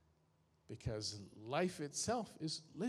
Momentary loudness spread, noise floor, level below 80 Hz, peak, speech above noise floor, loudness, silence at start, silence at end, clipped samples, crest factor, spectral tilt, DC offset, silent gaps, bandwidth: 9 LU; -76 dBFS; -66 dBFS; -22 dBFS; 33 dB; -42 LUFS; 0.7 s; 0 s; under 0.1%; 20 dB; -4 dB/octave; under 0.1%; none; 14.5 kHz